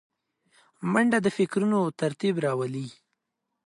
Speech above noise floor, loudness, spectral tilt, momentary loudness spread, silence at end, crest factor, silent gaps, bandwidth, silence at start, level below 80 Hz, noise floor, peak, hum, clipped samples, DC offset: 57 dB; -26 LUFS; -6.5 dB/octave; 11 LU; 0.75 s; 18 dB; none; 11.5 kHz; 0.8 s; -72 dBFS; -82 dBFS; -10 dBFS; none; under 0.1%; under 0.1%